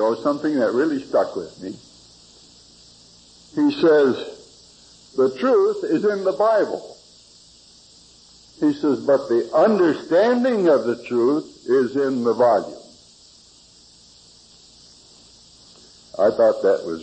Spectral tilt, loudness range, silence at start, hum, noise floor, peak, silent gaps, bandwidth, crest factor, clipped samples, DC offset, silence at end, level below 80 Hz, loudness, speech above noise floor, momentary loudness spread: -6 dB/octave; 7 LU; 0 s; none; -50 dBFS; -6 dBFS; none; 8.8 kHz; 14 dB; under 0.1%; under 0.1%; 0 s; -64 dBFS; -19 LUFS; 32 dB; 14 LU